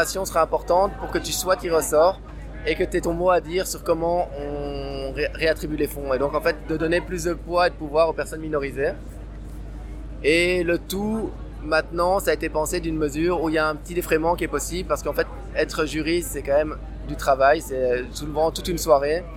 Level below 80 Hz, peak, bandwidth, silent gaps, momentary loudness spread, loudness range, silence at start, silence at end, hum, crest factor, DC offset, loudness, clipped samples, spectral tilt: -36 dBFS; -4 dBFS; 17 kHz; none; 11 LU; 3 LU; 0 s; 0 s; none; 20 dB; under 0.1%; -23 LUFS; under 0.1%; -4.5 dB/octave